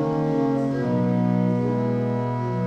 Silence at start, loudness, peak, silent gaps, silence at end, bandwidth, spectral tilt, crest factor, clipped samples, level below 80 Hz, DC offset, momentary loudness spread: 0 s; -23 LUFS; -10 dBFS; none; 0 s; 7.4 kHz; -9.5 dB/octave; 12 dB; under 0.1%; -56 dBFS; under 0.1%; 3 LU